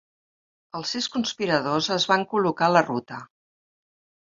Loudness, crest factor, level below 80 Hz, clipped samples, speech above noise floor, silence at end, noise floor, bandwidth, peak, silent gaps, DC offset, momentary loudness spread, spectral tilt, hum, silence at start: -23 LUFS; 24 dB; -68 dBFS; under 0.1%; over 66 dB; 1.1 s; under -90 dBFS; 7.8 kHz; -2 dBFS; none; under 0.1%; 14 LU; -4 dB/octave; none; 0.75 s